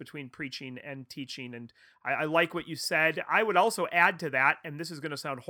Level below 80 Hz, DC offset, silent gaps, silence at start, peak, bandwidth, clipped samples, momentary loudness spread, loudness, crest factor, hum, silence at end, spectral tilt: -74 dBFS; under 0.1%; none; 0 s; -8 dBFS; over 20 kHz; under 0.1%; 16 LU; -28 LUFS; 22 dB; none; 0.05 s; -4 dB/octave